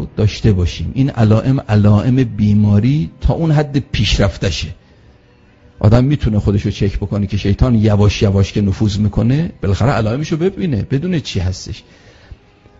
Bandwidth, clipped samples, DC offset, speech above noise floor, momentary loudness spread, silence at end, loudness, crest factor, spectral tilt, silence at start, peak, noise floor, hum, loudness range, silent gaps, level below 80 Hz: 7.8 kHz; under 0.1%; under 0.1%; 34 dB; 7 LU; 1 s; -15 LUFS; 14 dB; -7 dB/octave; 0 s; 0 dBFS; -47 dBFS; none; 4 LU; none; -28 dBFS